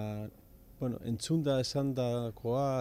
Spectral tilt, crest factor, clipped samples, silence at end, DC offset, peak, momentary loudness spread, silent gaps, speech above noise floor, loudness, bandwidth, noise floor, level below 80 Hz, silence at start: -6.5 dB/octave; 12 dB; under 0.1%; 0 s; under 0.1%; -20 dBFS; 9 LU; none; 24 dB; -34 LUFS; 16 kHz; -56 dBFS; -58 dBFS; 0 s